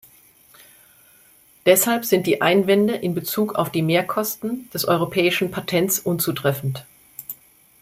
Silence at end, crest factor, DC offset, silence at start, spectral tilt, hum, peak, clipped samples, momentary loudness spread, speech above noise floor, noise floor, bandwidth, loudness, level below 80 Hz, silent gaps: 0.5 s; 20 dB; under 0.1%; 1.65 s; -4.5 dB/octave; none; -2 dBFS; under 0.1%; 18 LU; 33 dB; -53 dBFS; 16 kHz; -20 LUFS; -60 dBFS; none